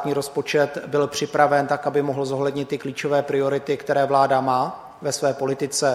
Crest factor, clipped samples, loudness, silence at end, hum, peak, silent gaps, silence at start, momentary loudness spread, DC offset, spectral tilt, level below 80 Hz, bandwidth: 20 dB; under 0.1%; -22 LUFS; 0 s; none; -2 dBFS; none; 0 s; 7 LU; under 0.1%; -4.5 dB/octave; -64 dBFS; 15.5 kHz